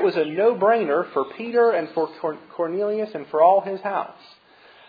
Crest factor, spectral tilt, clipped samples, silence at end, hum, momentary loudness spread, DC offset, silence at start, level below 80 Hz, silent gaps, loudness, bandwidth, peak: 18 dB; -8 dB/octave; under 0.1%; 0.75 s; none; 11 LU; under 0.1%; 0 s; -76 dBFS; none; -22 LUFS; 5 kHz; -4 dBFS